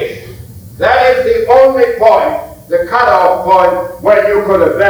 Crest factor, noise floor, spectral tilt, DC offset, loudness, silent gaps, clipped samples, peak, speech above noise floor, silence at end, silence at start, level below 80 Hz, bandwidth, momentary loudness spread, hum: 10 dB; -30 dBFS; -5.5 dB/octave; under 0.1%; -10 LUFS; none; 0.3%; 0 dBFS; 21 dB; 0 s; 0 s; -38 dBFS; over 20 kHz; 9 LU; none